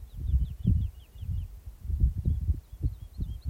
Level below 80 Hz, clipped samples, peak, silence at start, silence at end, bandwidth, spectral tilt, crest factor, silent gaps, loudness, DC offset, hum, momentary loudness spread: -32 dBFS; under 0.1%; -12 dBFS; 0 s; 0 s; 14.5 kHz; -9.5 dB/octave; 18 dB; none; -32 LUFS; under 0.1%; none; 11 LU